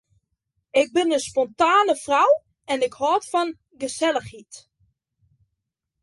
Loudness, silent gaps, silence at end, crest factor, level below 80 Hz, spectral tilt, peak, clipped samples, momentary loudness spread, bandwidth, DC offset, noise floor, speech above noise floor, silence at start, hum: -22 LUFS; none; 1.45 s; 18 dB; -64 dBFS; -3 dB/octave; -6 dBFS; under 0.1%; 12 LU; 11.5 kHz; under 0.1%; -80 dBFS; 59 dB; 0.75 s; none